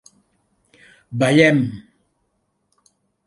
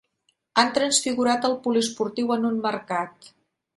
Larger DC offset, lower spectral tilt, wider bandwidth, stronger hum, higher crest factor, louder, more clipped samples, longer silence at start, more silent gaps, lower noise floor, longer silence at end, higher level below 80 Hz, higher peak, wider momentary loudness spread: neither; first, -6 dB/octave vs -2.5 dB/octave; about the same, 11.5 kHz vs 11.5 kHz; neither; about the same, 22 dB vs 22 dB; first, -16 LUFS vs -23 LUFS; neither; first, 1.1 s vs 0.55 s; neither; about the same, -70 dBFS vs -71 dBFS; first, 1.45 s vs 0.65 s; first, -60 dBFS vs -70 dBFS; first, 0 dBFS vs -4 dBFS; first, 19 LU vs 7 LU